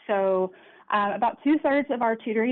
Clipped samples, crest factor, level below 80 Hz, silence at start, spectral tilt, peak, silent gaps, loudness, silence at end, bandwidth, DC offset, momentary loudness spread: under 0.1%; 12 dB; -68 dBFS; 0.1 s; -9 dB/octave; -12 dBFS; none; -25 LUFS; 0 s; 4.3 kHz; under 0.1%; 5 LU